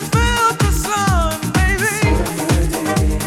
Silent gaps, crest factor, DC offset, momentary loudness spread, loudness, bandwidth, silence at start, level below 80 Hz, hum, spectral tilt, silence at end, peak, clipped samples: none; 12 dB; under 0.1%; 3 LU; -16 LUFS; 18 kHz; 0 s; -22 dBFS; none; -4.5 dB/octave; 0 s; -4 dBFS; under 0.1%